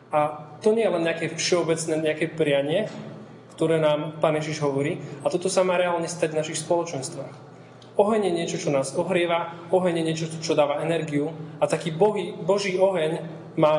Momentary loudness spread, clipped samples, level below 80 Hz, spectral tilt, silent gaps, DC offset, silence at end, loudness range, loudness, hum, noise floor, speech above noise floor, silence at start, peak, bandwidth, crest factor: 8 LU; under 0.1%; -72 dBFS; -5 dB/octave; none; under 0.1%; 0 s; 2 LU; -24 LUFS; none; -46 dBFS; 22 dB; 0.1 s; -4 dBFS; 11.5 kHz; 20 dB